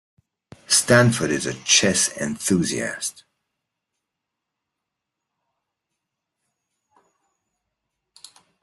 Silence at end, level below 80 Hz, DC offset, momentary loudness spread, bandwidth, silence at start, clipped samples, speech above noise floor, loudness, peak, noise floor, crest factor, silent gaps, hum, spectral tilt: 5.5 s; -60 dBFS; under 0.1%; 11 LU; 12.5 kHz; 0.7 s; under 0.1%; 63 dB; -19 LUFS; -2 dBFS; -83 dBFS; 24 dB; none; none; -3 dB/octave